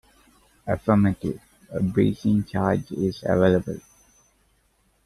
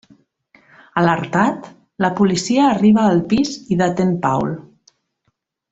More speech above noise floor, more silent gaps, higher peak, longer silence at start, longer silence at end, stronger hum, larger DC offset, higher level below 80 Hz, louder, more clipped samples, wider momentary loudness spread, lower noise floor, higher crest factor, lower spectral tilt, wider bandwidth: second, 43 dB vs 53 dB; neither; second, -6 dBFS vs -2 dBFS; second, 0.65 s vs 0.95 s; first, 1.25 s vs 1.1 s; neither; neither; about the same, -50 dBFS vs -52 dBFS; second, -23 LUFS vs -17 LUFS; neither; first, 15 LU vs 9 LU; second, -65 dBFS vs -69 dBFS; about the same, 18 dB vs 16 dB; first, -8.5 dB/octave vs -6 dB/octave; first, 12.5 kHz vs 8 kHz